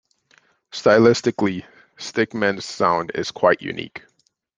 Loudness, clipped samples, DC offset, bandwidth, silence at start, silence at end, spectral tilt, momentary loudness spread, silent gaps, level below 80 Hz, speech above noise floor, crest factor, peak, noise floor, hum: -20 LUFS; under 0.1%; under 0.1%; 9.6 kHz; 0.75 s; 0.6 s; -5 dB/octave; 19 LU; none; -62 dBFS; 40 dB; 20 dB; -2 dBFS; -59 dBFS; none